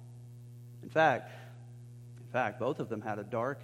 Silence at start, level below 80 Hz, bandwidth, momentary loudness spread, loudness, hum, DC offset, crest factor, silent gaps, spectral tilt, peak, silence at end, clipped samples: 0 s; -74 dBFS; 15.5 kHz; 23 LU; -33 LUFS; 60 Hz at -50 dBFS; under 0.1%; 22 dB; none; -6.5 dB/octave; -12 dBFS; 0 s; under 0.1%